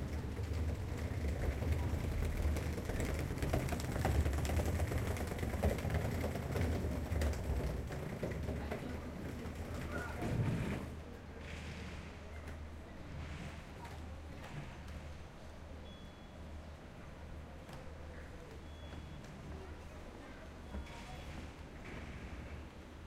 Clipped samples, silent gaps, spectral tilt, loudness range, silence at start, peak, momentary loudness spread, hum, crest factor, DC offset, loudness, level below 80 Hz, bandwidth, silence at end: under 0.1%; none; -6.5 dB/octave; 13 LU; 0 s; -22 dBFS; 14 LU; none; 18 dB; under 0.1%; -42 LUFS; -44 dBFS; 16 kHz; 0 s